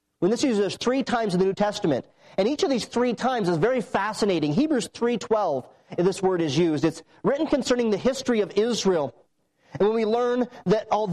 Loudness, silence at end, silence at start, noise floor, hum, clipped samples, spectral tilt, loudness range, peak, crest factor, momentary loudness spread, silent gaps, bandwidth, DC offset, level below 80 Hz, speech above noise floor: -24 LUFS; 0 s; 0.2 s; -63 dBFS; none; under 0.1%; -5.5 dB/octave; 1 LU; -12 dBFS; 12 dB; 4 LU; none; 12.5 kHz; under 0.1%; -58 dBFS; 40 dB